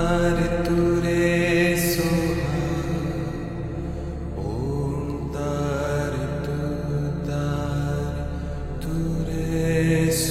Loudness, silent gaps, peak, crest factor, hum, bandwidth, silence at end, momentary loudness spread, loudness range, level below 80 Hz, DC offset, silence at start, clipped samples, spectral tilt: -24 LUFS; none; -8 dBFS; 16 dB; none; 16 kHz; 0 s; 10 LU; 5 LU; -34 dBFS; under 0.1%; 0 s; under 0.1%; -6 dB/octave